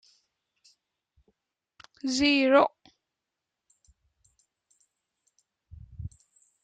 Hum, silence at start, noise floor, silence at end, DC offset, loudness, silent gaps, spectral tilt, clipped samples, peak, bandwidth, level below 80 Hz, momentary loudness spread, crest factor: none; 2.05 s; -87 dBFS; 0.55 s; under 0.1%; -24 LUFS; none; -4 dB/octave; under 0.1%; -8 dBFS; 9.2 kHz; -60 dBFS; 24 LU; 24 dB